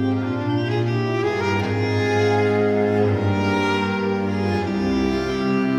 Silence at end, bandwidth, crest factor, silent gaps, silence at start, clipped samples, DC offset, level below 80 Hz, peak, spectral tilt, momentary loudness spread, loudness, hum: 0 s; 10.5 kHz; 12 dB; none; 0 s; under 0.1%; under 0.1%; -44 dBFS; -8 dBFS; -7 dB/octave; 4 LU; -21 LUFS; none